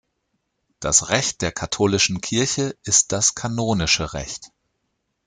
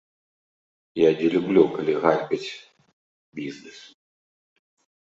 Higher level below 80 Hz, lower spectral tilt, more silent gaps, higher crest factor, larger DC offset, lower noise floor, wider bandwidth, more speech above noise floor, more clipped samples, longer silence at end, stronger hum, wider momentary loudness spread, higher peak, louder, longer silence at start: first, -46 dBFS vs -68 dBFS; second, -2.5 dB/octave vs -6.5 dB/octave; second, none vs 2.93-3.32 s; about the same, 20 dB vs 22 dB; neither; second, -74 dBFS vs under -90 dBFS; first, 11 kHz vs 7.8 kHz; second, 53 dB vs over 68 dB; neither; second, 0.8 s vs 1.25 s; neither; second, 12 LU vs 22 LU; about the same, -2 dBFS vs -4 dBFS; about the same, -20 LUFS vs -22 LUFS; second, 0.8 s vs 0.95 s